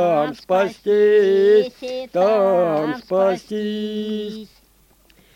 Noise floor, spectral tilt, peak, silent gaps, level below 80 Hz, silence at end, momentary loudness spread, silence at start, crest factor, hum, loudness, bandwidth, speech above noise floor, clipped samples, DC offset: -55 dBFS; -6.5 dB/octave; -6 dBFS; none; -60 dBFS; 0.9 s; 12 LU; 0 s; 14 dB; none; -19 LUFS; 9 kHz; 37 dB; under 0.1%; under 0.1%